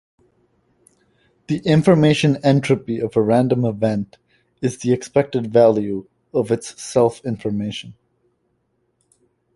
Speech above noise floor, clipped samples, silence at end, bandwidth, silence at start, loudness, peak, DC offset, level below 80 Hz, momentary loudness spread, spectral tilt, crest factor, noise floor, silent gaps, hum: 50 dB; under 0.1%; 1.65 s; 11.5 kHz; 1.5 s; -19 LUFS; -2 dBFS; under 0.1%; -54 dBFS; 12 LU; -6.5 dB/octave; 18 dB; -68 dBFS; none; none